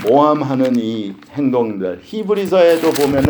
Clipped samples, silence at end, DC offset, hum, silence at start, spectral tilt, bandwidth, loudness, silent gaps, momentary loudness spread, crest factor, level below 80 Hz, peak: under 0.1%; 0 s; under 0.1%; none; 0 s; -6 dB/octave; over 20 kHz; -16 LUFS; none; 12 LU; 14 dB; -52 dBFS; 0 dBFS